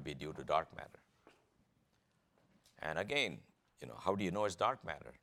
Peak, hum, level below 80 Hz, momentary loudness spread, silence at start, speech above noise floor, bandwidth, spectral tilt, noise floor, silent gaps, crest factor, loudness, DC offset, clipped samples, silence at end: -18 dBFS; none; -68 dBFS; 18 LU; 0 s; 38 dB; 16.5 kHz; -4.5 dB/octave; -77 dBFS; none; 24 dB; -38 LUFS; under 0.1%; under 0.1%; 0.1 s